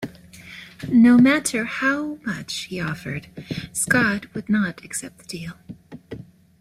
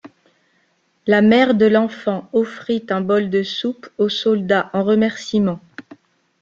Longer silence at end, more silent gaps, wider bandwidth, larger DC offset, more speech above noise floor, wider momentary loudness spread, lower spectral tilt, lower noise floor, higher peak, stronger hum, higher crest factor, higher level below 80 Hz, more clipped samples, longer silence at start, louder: second, 0.35 s vs 0.6 s; neither; first, 14.5 kHz vs 7.4 kHz; neither; second, 22 dB vs 46 dB; first, 24 LU vs 11 LU; second, -4.5 dB/octave vs -6.5 dB/octave; second, -43 dBFS vs -63 dBFS; about the same, -4 dBFS vs -2 dBFS; neither; about the same, 18 dB vs 16 dB; about the same, -56 dBFS vs -60 dBFS; neither; about the same, 0 s vs 0.05 s; second, -21 LUFS vs -18 LUFS